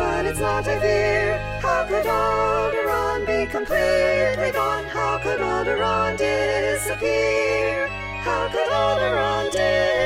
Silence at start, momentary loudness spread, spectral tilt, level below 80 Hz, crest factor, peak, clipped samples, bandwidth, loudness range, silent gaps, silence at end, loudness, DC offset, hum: 0 s; 4 LU; -4.5 dB/octave; -38 dBFS; 14 dB; -8 dBFS; under 0.1%; 16.5 kHz; 1 LU; none; 0 s; -21 LUFS; under 0.1%; none